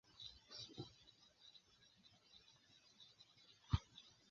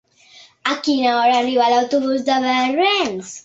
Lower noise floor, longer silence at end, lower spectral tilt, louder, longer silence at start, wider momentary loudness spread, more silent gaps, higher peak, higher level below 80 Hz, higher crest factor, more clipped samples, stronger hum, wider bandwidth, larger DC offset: first, -72 dBFS vs -48 dBFS; about the same, 0.15 s vs 0.05 s; first, -5 dB/octave vs -3 dB/octave; second, -51 LUFS vs -17 LUFS; second, 0.1 s vs 0.65 s; first, 23 LU vs 6 LU; neither; second, -24 dBFS vs -2 dBFS; about the same, -60 dBFS vs -64 dBFS; first, 28 dB vs 16 dB; neither; neither; second, 7.2 kHz vs 8 kHz; neither